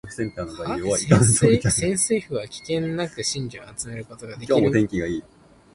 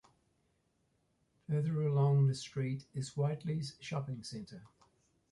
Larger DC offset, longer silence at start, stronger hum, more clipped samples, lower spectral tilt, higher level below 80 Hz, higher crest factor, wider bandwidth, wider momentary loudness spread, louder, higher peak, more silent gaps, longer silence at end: neither; second, 0.05 s vs 1.5 s; neither; neither; second, -5 dB/octave vs -7 dB/octave; first, -46 dBFS vs -72 dBFS; first, 22 dB vs 16 dB; about the same, 11.5 kHz vs 11.5 kHz; about the same, 16 LU vs 17 LU; first, -22 LUFS vs -35 LUFS; first, 0 dBFS vs -22 dBFS; neither; about the same, 0.55 s vs 0.65 s